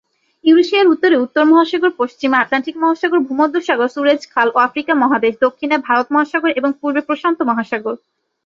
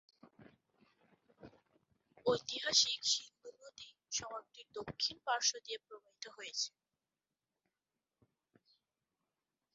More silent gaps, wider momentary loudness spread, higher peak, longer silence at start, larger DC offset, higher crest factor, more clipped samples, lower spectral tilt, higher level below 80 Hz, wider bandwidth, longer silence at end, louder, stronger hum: neither; second, 7 LU vs 24 LU; first, 0 dBFS vs -14 dBFS; first, 0.45 s vs 0.25 s; neither; second, 14 dB vs 28 dB; neither; first, -4.5 dB/octave vs 0.5 dB/octave; first, -64 dBFS vs -78 dBFS; about the same, 7.4 kHz vs 7.6 kHz; second, 0.5 s vs 3.05 s; first, -15 LUFS vs -36 LUFS; neither